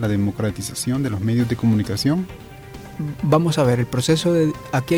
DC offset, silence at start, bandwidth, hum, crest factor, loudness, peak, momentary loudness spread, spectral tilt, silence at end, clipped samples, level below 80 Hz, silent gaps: under 0.1%; 0 s; 17 kHz; none; 14 dB; -20 LUFS; -6 dBFS; 14 LU; -6 dB/octave; 0 s; under 0.1%; -46 dBFS; none